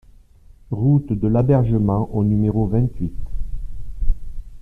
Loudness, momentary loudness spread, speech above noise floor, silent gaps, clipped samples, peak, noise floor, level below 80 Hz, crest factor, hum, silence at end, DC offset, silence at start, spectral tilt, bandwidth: -20 LUFS; 17 LU; 29 dB; none; under 0.1%; -4 dBFS; -47 dBFS; -28 dBFS; 16 dB; none; 0 s; under 0.1%; 0.5 s; -12 dB/octave; 3.4 kHz